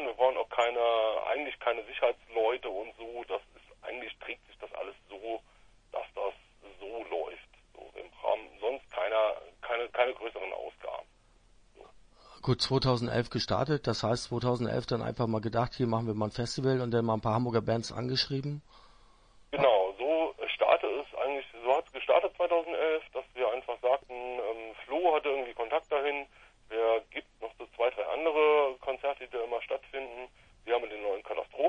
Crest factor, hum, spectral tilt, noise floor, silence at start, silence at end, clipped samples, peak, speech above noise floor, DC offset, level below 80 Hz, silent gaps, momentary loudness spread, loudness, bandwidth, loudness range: 20 dB; none; -6 dB/octave; -63 dBFS; 0 s; 0 s; under 0.1%; -12 dBFS; 31 dB; under 0.1%; -60 dBFS; none; 14 LU; -31 LUFS; 10.5 kHz; 9 LU